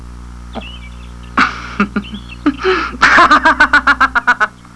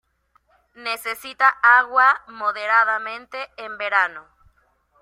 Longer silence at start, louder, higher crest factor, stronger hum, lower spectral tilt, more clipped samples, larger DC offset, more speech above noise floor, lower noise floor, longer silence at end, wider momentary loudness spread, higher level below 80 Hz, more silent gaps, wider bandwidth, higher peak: second, 0 s vs 0.8 s; first, -11 LUFS vs -19 LUFS; second, 14 dB vs 20 dB; first, 60 Hz at -30 dBFS vs none; first, -4 dB/octave vs -0.5 dB/octave; neither; neither; second, 20 dB vs 43 dB; second, -30 dBFS vs -64 dBFS; second, 0.25 s vs 0.8 s; first, 21 LU vs 17 LU; first, -32 dBFS vs -66 dBFS; neither; second, 11 kHz vs 16 kHz; about the same, 0 dBFS vs -2 dBFS